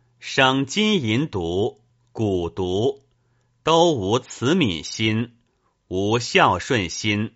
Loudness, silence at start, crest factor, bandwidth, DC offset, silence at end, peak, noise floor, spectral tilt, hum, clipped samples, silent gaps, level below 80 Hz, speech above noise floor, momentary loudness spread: -21 LUFS; 0.2 s; 20 dB; 8 kHz; under 0.1%; 0.05 s; -2 dBFS; -67 dBFS; -3.5 dB/octave; none; under 0.1%; none; -52 dBFS; 46 dB; 10 LU